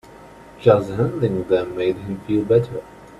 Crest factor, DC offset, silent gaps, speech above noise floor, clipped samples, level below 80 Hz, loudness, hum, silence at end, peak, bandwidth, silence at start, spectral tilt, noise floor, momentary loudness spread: 20 dB; under 0.1%; none; 24 dB; under 0.1%; -50 dBFS; -20 LUFS; none; 0.05 s; -2 dBFS; 12 kHz; 0.1 s; -8.5 dB/octave; -43 dBFS; 10 LU